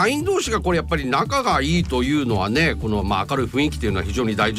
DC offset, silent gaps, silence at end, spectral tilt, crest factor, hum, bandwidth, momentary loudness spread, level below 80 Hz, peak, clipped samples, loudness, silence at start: under 0.1%; none; 0 s; -5 dB/octave; 12 dB; none; 15.5 kHz; 3 LU; -32 dBFS; -8 dBFS; under 0.1%; -21 LUFS; 0 s